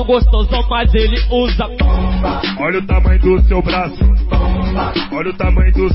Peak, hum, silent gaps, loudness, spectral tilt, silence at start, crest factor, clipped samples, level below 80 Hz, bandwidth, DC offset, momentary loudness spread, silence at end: -2 dBFS; none; none; -15 LUFS; -11.5 dB/octave; 0 s; 10 dB; under 0.1%; -14 dBFS; 5.8 kHz; under 0.1%; 5 LU; 0 s